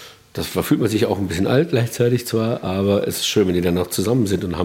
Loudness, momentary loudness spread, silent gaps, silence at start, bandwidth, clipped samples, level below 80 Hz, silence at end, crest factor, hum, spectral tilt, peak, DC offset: -19 LUFS; 4 LU; none; 0 s; 17 kHz; under 0.1%; -50 dBFS; 0 s; 16 dB; none; -5.5 dB/octave; -2 dBFS; under 0.1%